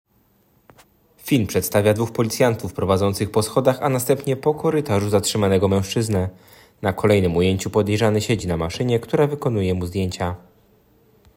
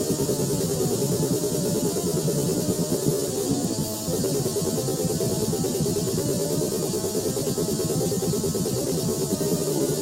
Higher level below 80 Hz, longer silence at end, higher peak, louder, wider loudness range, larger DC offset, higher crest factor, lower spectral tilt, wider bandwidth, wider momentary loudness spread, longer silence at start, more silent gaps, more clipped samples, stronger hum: about the same, -50 dBFS vs -48 dBFS; first, 1 s vs 0 s; first, -4 dBFS vs -8 dBFS; first, -20 LUFS vs -25 LUFS; about the same, 2 LU vs 1 LU; neither; about the same, 18 dB vs 16 dB; about the same, -5.5 dB/octave vs -5 dB/octave; about the same, 16.5 kHz vs 16 kHz; first, 7 LU vs 1 LU; first, 1.25 s vs 0 s; neither; neither; neither